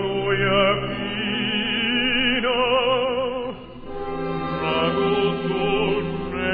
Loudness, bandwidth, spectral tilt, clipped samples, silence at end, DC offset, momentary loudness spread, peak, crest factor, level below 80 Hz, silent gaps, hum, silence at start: -21 LUFS; 5 kHz; -8.5 dB/octave; under 0.1%; 0 s; under 0.1%; 10 LU; -6 dBFS; 16 dB; -42 dBFS; none; none; 0 s